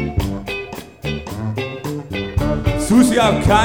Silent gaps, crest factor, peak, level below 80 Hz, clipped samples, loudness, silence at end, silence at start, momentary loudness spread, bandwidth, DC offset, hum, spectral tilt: none; 16 dB; -2 dBFS; -30 dBFS; under 0.1%; -19 LUFS; 0 s; 0 s; 13 LU; 19 kHz; 0.1%; none; -5.5 dB/octave